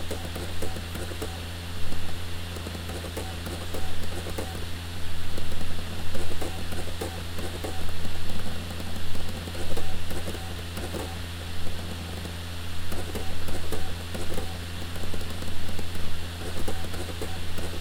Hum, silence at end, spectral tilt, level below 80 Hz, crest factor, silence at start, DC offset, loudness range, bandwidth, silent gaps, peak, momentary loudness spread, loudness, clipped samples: none; 0 s; -4.5 dB/octave; -38 dBFS; 14 dB; 0 s; under 0.1%; 0 LU; 16.5 kHz; none; -10 dBFS; 2 LU; -35 LUFS; under 0.1%